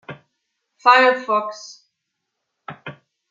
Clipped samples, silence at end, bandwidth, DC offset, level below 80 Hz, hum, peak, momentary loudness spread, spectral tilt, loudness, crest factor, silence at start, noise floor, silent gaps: under 0.1%; 0.4 s; 7.6 kHz; under 0.1%; -78 dBFS; none; -2 dBFS; 26 LU; -3.5 dB/octave; -16 LUFS; 20 dB; 0.1 s; -78 dBFS; none